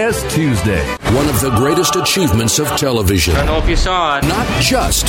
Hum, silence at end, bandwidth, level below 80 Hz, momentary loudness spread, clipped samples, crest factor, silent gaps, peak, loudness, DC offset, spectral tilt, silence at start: none; 0 s; 16.5 kHz; -22 dBFS; 3 LU; under 0.1%; 12 dB; none; -2 dBFS; -14 LUFS; under 0.1%; -4 dB/octave; 0 s